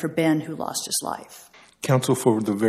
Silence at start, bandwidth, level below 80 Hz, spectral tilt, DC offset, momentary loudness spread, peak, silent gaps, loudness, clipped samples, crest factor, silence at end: 0 s; 15.5 kHz; -66 dBFS; -5 dB/octave; under 0.1%; 12 LU; -4 dBFS; none; -23 LUFS; under 0.1%; 18 dB; 0 s